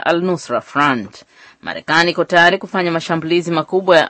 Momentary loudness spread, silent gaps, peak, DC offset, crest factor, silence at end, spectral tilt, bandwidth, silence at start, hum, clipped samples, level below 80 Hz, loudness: 14 LU; none; 0 dBFS; under 0.1%; 16 dB; 0 s; -5 dB/octave; 8.8 kHz; 0.05 s; none; under 0.1%; -60 dBFS; -15 LUFS